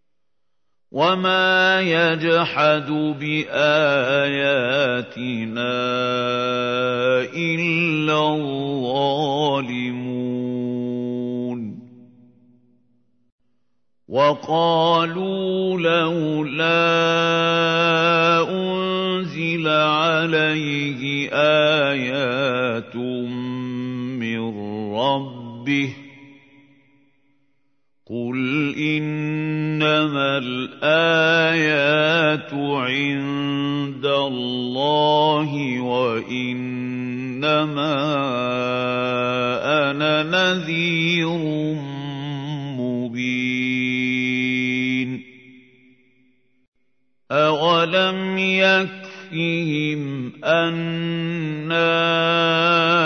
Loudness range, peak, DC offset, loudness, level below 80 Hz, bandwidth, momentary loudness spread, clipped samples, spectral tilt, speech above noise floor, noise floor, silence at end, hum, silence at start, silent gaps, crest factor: 8 LU; -4 dBFS; under 0.1%; -20 LUFS; -68 dBFS; 6.6 kHz; 10 LU; under 0.1%; -5.5 dB/octave; 60 dB; -80 dBFS; 0 s; none; 0.95 s; 13.32-13.38 s, 46.68-46.72 s; 16 dB